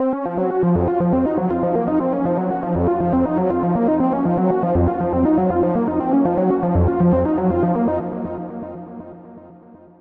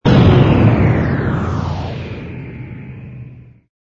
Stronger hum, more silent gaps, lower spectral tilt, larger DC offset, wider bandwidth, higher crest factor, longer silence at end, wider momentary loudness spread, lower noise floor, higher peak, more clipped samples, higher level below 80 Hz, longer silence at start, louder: neither; neither; first, -12.5 dB/octave vs -9 dB/octave; neither; second, 3.6 kHz vs 7 kHz; about the same, 12 dB vs 14 dB; about the same, 0.45 s vs 0.45 s; second, 10 LU vs 22 LU; first, -44 dBFS vs -36 dBFS; second, -6 dBFS vs 0 dBFS; neither; second, -38 dBFS vs -28 dBFS; about the same, 0 s vs 0.05 s; second, -19 LUFS vs -14 LUFS